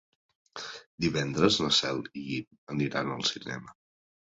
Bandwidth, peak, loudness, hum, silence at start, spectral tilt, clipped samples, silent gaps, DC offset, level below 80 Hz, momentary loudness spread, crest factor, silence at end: 8.4 kHz; -8 dBFS; -29 LUFS; none; 0.55 s; -4 dB/octave; under 0.1%; 0.86-0.98 s, 2.47-2.51 s, 2.58-2.67 s; under 0.1%; -60 dBFS; 17 LU; 24 dB; 0.65 s